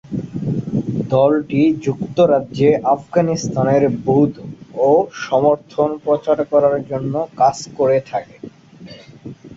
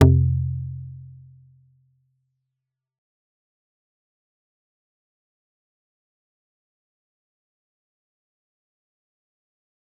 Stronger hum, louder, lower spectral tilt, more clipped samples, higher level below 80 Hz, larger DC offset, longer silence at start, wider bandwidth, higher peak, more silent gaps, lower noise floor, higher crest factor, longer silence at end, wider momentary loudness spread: neither; first, -17 LUFS vs -22 LUFS; second, -7 dB/octave vs -9.5 dB/octave; neither; about the same, -52 dBFS vs -48 dBFS; neither; about the same, 0.05 s vs 0 s; first, 7.8 kHz vs 3.9 kHz; about the same, -2 dBFS vs -2 dBFS; neither; second, -39 dBFS vs -84 dBFS; second, 16 dB vs 28 dB; second, 0 s vs 8.95 s; second, 10 LU vs 24 LU